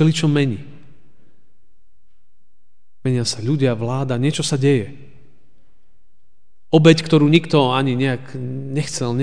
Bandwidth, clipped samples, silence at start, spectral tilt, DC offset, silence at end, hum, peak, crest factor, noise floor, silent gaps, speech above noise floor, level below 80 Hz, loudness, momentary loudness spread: 10 kHz; under 0.1%; 0 s; -6 dB/octave; 2%; 0 s; none; 0 dBFS; 20 dB; -70 dBFS; none; 53 dB; -56 dBFS; -18 LUFS; 13 LU